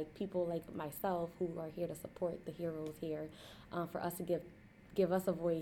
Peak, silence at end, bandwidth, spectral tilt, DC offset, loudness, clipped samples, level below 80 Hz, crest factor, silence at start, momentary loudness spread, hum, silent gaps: -22 dBFS; 0 s; 18.5 kHz; -6.5 dB/octave; under 0.1%; -40 LUFS; under 0.1%; -66 dBFS; 18 dB; 0 s; 10 LU; none; none